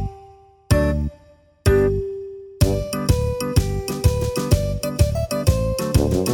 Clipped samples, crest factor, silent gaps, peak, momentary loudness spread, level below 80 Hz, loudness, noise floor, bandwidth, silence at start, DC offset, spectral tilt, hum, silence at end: under 0.1%; 18 dB; none; -2 dBFS; 7 LU; -28 dBFS; -21 LUFS; -51 dBFS; 19.5 kHz; 0 s; under 0.1%; -6 dB/octave; none; 0 s